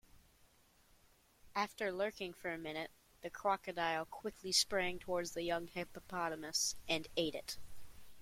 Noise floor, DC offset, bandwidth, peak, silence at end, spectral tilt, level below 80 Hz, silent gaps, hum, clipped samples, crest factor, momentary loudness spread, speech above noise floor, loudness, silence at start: -69 dBFS; under 0.1%; 16.5 kHz; -20 dBFS; 0 s; -2 dB/octave; -66 dBFS; none; none; under 0.1%; 22 dB; 11 LU; 29 dB; -39 LUFS; 0.15 s